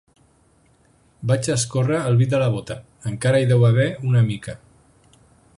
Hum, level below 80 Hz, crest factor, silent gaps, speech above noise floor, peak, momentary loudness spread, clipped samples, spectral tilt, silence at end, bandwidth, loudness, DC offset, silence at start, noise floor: none; -52 dBFS; 16 dB; none; 39 dB; -6 dBFS; 15 LU; under 0.1%; -6 dB/octave; 1 s; 11.5 kHz; -20 LUFS; under 0.1%; 1.2 s; -58 dBFS